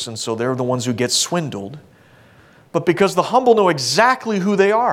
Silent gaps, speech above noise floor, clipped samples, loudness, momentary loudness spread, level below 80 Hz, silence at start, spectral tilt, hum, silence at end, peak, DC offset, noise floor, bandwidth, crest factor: none; 32 dB; under 0.1%; -17 LUFS; 10 LU; -62 dBFS; 0 s; -4 dB/octave; none; 0 s; 0 dBFS; under 0.1%; -49 dBFS; 16.5 kHz; 16 dB